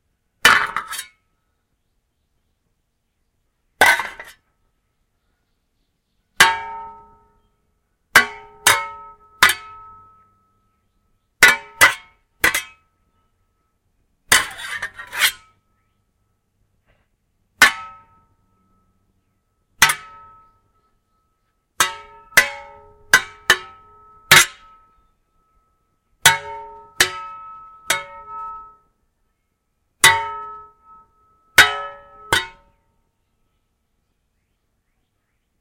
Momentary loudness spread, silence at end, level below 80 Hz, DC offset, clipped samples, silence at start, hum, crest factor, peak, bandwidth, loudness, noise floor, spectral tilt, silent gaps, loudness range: 22 LU; 3.1 s; -52 dBFS; under 0.1%; under 0.1%; 0.45 s; none; 22 dB; 0 dBFS; 16 kHz; -16 LUFS; -71 dBFS; 0 dB/octave; none; 7 LU